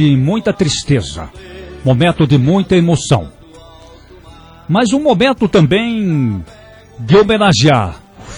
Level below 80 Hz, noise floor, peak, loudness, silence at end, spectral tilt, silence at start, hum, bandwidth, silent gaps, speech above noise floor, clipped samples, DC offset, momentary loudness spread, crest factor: -38 dBFS; -38 dBFS; 0 dBFS; -12 LUFS; 0 s; -6 dB/octave; 0 s; none; 11 kHz; none; 27 dB; under 0.1%; under 0.1%; 18 LU; 14 dB